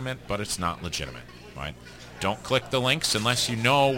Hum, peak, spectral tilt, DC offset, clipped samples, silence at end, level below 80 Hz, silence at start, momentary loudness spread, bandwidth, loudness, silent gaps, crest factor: 60 Hz at -50 dBFS; -6 dBFS; -3.5 dB/octave; under 0.1%; under 0.1%; 0 s; -50 dBFS; 0 s; 18 LU; 17 kHz; -25 LUFS; none; 20 dB